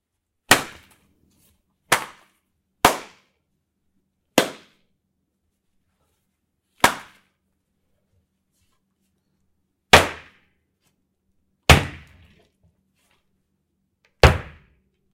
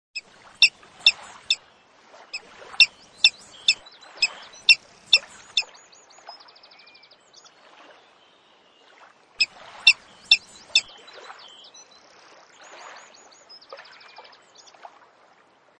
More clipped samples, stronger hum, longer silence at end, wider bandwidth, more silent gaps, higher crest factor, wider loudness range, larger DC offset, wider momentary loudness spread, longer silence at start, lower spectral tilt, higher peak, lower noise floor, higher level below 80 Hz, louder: neither; neither; second, 0.7 s vs 2.05 s; first, 16 kHz vs 10.5 kHz; neither; about the same, 26 dB vs 26 dB; about the same, 8 LU vs 10 LU; neither; second, 20 LU vs 26 LU; first, 0.5 s vs 0.15 s; first, -3.5 dB/octave vs 2.5 dB/octave; about the same, 0 dBFS vs 0 dBFS; first, -74 dBFS vs -58 dBFS; first, -36 dBFS vs -70 dBFS; about the same, -19 LUFS vs -20 LUFS